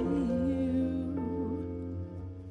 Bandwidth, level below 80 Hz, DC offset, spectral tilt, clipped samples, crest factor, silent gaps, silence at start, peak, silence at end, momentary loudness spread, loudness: 8.2 kHz; -48 dBFS; under 0.1%; -9.5 dB/octave; under 0.1%; 12 dB; none; 0 s; -20 dBFS; 0 s; 10 LU; -33 LUFS